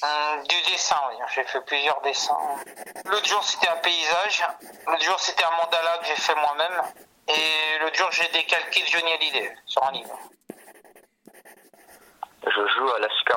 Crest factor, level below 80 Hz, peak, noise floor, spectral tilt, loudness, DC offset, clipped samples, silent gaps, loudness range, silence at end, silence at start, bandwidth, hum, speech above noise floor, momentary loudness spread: 18 dB; -74 dBFS; -6 dBFS; -55 dBFS; 1 dB/octave; -23 LUFS; under 0.1%; under 0.1%; none; 6 LU; 0 s; 0 s; 17 kHz; none; 30 dB; 11 LU